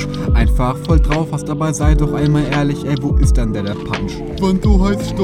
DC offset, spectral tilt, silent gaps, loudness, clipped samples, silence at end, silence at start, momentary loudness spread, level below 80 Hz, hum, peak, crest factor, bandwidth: under 0.1%; -7 dB/octave; none; -16 LUFS; under 0.1%; 0 s; 0 s; 7 LU; -18 dBFS; none; 0 dBFS; 14 dB; 13 kHz